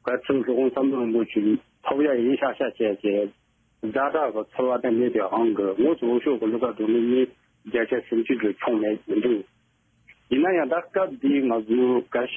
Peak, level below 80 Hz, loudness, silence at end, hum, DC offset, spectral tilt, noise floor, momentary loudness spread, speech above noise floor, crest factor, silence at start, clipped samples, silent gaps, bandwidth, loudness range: -10 dBFS; -66 dBFS; -24 LUFS; 0 s; none; under 0.1%; -8.5 dB/octave; -65 dBFS; 5 LU; 42 dB; 14 dB; 0.05 s; under 0.1%; none; 3.6 kHz; 2 LU